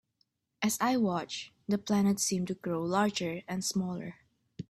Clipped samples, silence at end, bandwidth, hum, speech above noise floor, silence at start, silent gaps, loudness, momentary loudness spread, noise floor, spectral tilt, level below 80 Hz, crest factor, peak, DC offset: under 0.1%; 0.1 s; 14.5 kHz; none; 46 dB; 0.6 s; none; -31 LUFS; 10 LU; -77 dBFS; -4.5 dB/octave; -68 dBFS; 18 dB; -14 dBFS; under 0.1%